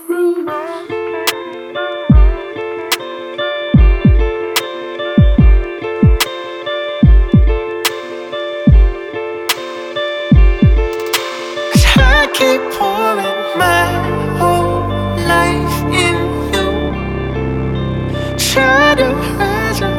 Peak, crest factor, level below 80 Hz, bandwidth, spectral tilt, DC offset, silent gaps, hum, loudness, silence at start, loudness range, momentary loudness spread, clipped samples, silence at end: 0 dBFS; 12 dB; -16 dBFS; 18.5 kHz; -5 dB/octave; under 0.1%; none; none; -14 LUFS; 0 s; 3 LU; 12 LU; under 0.1%; 0 s